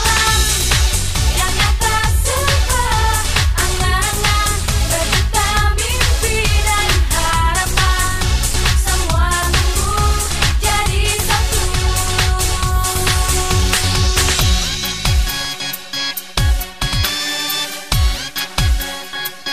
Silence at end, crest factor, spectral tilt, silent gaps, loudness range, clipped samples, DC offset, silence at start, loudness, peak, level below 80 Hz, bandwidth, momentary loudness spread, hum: 0 s; 14 dB; -2.5 dB/octave; none; 3 LU; under 0.1%; 1%; 0 s; -16 LUFS; 0 dBFS; -18 dBFS; 15.5 kHz; 5 LU; none